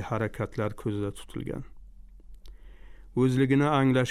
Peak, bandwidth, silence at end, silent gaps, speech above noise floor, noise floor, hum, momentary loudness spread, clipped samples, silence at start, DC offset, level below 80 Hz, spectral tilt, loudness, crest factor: -12 dBFS; 13 kHz; 0 s; none; 21 dB; -48 dBFS; none; 14 LU; under 0.1%; 0 s; under 0.1%; -50 dBFS; -7.5 dB/octave; -28 LUFS; 16 dB